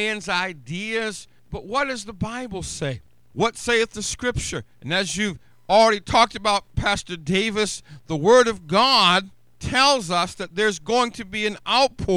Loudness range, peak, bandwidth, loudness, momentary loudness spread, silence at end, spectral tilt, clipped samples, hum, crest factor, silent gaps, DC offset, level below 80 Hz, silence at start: 7 LU; -2 dBFS; 15 kHz; -21 LUFS; 14 LU; 0 s; -3.5 dB/octave; under 0.1%; none; 20 dB; none; 0.3%; -44 dBFS; 0 s